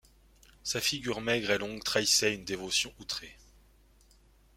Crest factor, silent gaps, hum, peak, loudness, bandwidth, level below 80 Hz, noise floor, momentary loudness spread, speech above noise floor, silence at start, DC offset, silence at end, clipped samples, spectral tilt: 22 dB; none; none; -12 dBFS; -30 LUFS; 16.5 kHz; -60 dBFS; -62 dBFS; 13 LU; 30 dB; 0.65 s; under 0.1%; 1.2 s; under 0.1%; -2 dB/octave